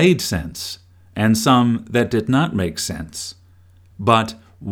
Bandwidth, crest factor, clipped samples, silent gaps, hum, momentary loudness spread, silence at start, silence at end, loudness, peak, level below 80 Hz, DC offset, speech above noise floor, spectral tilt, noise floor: 18.5 kHz; 20 dB; under 0.1%; none; none; 15 LU; 0 s; 0 s; -19 LUFS; 0 dBFS; -44 dBFS; under 0.1%; 31 dB; -5 dB/octave; -49 dBFS